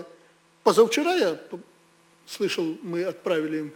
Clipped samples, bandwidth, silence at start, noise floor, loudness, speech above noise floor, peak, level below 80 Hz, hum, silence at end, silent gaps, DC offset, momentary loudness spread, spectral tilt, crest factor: under 0.1%; 19.5 kHz; 0 s; -59 dBFS; -24 LUFS; 35 dB; -6 dBFS; -76 dBFS; none; 0 s; none; under 0.1%; 18 LU; -4 dB/octave; 20 dB